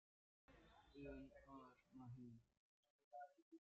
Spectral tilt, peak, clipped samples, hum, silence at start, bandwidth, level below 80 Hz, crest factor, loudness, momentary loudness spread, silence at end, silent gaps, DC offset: -6.5 dB/octave; -46 dBFS; under 0.1%; none; 0.5 s; 7 kHz; -76 dBFS; 18 dB; -62 LUFS; 6 LU; 0 s; 2.57-2.83 s, 2.90-3.11 s, 3.42-3.51 s; under 0.1%